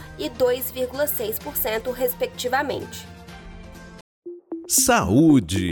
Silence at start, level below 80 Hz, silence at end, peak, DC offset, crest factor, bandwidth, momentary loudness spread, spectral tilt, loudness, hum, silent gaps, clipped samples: 0 s; -46 dBFS; 0 s; -6 dBFS; under 0.1%; 18 dB; over 20 kHz; 25 LU; -4 dB/octave; -21 LUFS; none; 4.01-4.22 s; under 0.1%